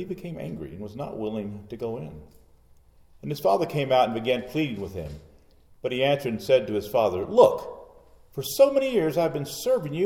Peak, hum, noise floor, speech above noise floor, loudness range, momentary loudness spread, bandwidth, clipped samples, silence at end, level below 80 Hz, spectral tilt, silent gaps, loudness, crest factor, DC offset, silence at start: -4 dBFS; none; -55 dBFS; 31 dB; 8 LU; 17 LU; 19 kHz; under 0.1%; 0 s; -56 dBFS; -5.5 dB/octave; none; -25 LUFS; 22 dB; under 0.1%; 0 s